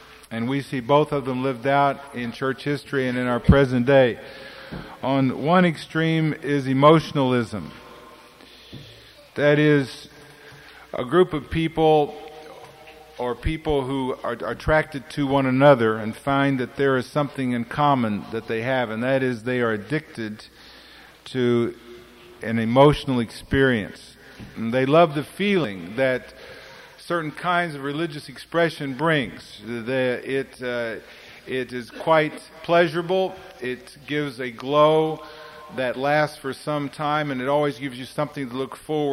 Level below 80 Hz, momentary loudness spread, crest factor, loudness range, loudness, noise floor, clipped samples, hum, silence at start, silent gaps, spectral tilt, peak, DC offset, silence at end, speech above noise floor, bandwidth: -44 dBFS; 19 LU; 20 dB; 5 LU; -22 LUFS; -47 dBFS; under 0.1%; none; 0.1 s; none; -7 dB/octave; -4 dBFS; under 0.1%; 0 s; 25 dB; 16 kHz